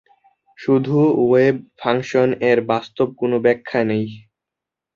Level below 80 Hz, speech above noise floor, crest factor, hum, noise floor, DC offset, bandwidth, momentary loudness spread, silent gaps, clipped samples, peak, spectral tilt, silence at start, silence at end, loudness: -60 dBFS; 68 dB; 16 dB; none; -85 dBFS; under 0.1%; 7.2 kHz; 8 LU; none; under 0.1%; -2 dBFS; -7.5 dB/octave; 0.6 s; 0.75 s; -18 LUFS